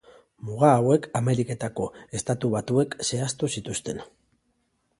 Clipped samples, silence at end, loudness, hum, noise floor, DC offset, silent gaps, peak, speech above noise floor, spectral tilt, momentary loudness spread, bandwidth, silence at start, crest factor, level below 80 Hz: under 0.1%; 0.95 s; -25 LUFS; none; -72 dBFS; under 0.1%; none; -4 dBFS; 47 dB; -5.5 dB/octave; 13 LU; 11.5 kHz; 0.45 s; 22 dB; -58 dBFS